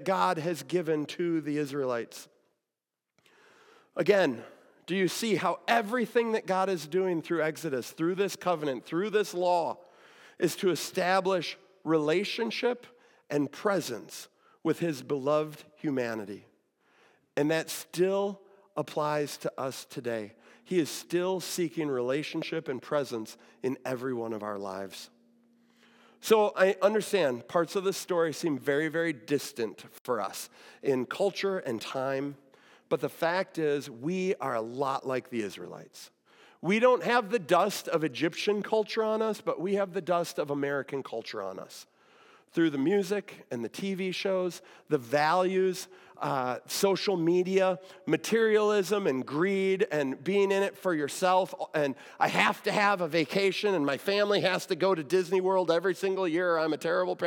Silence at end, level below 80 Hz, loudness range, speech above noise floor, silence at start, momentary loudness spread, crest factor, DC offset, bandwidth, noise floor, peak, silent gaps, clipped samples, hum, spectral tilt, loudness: 0 s; under -90 dBFS; 6 LU; 60 dB; 0 s; 11 LU; 20 dB; under 0.1%; 18 kHz; -89 dBFS; -8 dBFS; 30.00-30.05 s; under 0.1%; none; -4.5 dB/octave; -29 LUFS